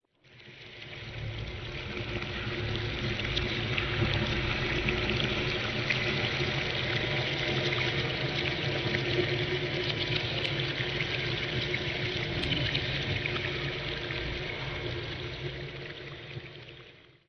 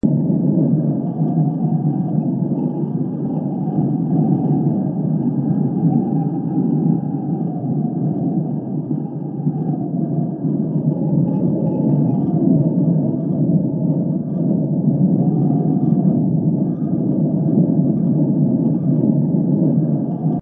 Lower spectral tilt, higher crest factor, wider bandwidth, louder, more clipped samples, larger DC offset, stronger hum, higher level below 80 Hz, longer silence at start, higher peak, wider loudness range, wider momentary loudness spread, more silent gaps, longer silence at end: second, -5.5 dB/octave vs -15.5 dB/octave; about the same, 20 dB vs 16 dB; first, 6.6 kHz vs 1.7 kHz; second, -31 LUFS vs -18 LUFS; neither; neither; neither; first, -46 dBFS vs -52 dBFS; first, 0.3 s vs 0.05 s; second, -12 dBFS vs -2 dBFS; about the same, 6 LU vs 4 LU; first, 12 LU vs 6 LU; neither; first, 0.25 s vs 0 s